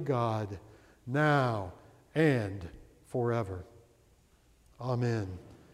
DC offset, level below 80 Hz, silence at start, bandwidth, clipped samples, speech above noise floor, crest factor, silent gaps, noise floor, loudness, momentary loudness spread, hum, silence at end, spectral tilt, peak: under 0.1%; -62 dBFS; 0 s; 13 kHz; under 0.1%; 34 dB; 18 dB; none; -64 dBFS; -32 LUFS; 18 LU; none; 0.15 s; -7.5 dB/octave; -14 dBFS